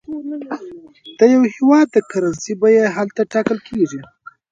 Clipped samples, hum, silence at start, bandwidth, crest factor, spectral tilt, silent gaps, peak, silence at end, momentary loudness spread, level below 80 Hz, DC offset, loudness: under 0.1%; none; 0.1 s; 7.8 kHz; 16 dB; -6 dB/octave; none; 0 dBFS; 0.5 s; 16 LU; -58 dBFS; under 0.1%; -16 LUFS